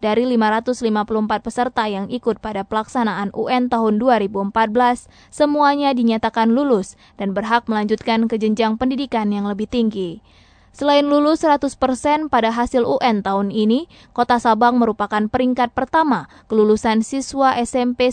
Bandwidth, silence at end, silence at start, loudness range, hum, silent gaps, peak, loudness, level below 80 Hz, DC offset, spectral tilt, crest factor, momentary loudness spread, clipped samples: 9.4 kHz; 0 s; 0 s; 3 LU; none; none; -2 dBFS; -18 LUFS; -48 dBFS; under 0.1%; -5.5 dB/octave; 16 dB; 7 LU; under 0.1%